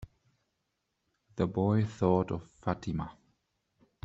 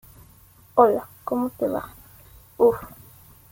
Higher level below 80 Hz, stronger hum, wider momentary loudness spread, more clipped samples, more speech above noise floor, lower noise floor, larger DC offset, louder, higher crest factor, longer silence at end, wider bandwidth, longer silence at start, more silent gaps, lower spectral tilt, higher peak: about the same, -58 dBFS vs -56 dBFS; neither; second, 10 LU vs 15 LU; neither; first, 51 dB vs 31 dB; first, -82 dBFS vs -52 dBFS; neither; second, -32 LUFS vs -23 LUFS; about the same, 22 dB vs 22 dB; first, 0.95 s vs 0.65 s; second, 7.8 kHz vs 17 kHz; second, 0 s vs 0.75 s; neither; first, -8.5 dB/octave vs -7 dB/octave; second, -12 dBFS vs -2 dBFS